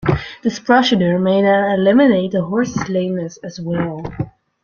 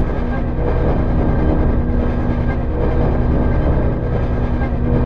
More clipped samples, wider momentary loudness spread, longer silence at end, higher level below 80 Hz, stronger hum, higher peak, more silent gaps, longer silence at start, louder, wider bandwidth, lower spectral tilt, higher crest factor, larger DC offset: neither; first, 14 LU vs 3 LU; first, 0.35 s vs 0 s; second, -44 dBFS vs -18 dBFS; second, none vs 60 Hz at -25 dBFS; about the same, -2 dBFS vs -4 dBFS; neither; about the same, 0 s vs 0 s; about the same, -16 LUFS vs -18 LUFS; first, 7.2 kHz vs 5.2 kHz; second, -6.5 dB/octave vs -10.5 dB/octave; about the same, 14 dB vs 12 dB; second, under 0.1% vs 1%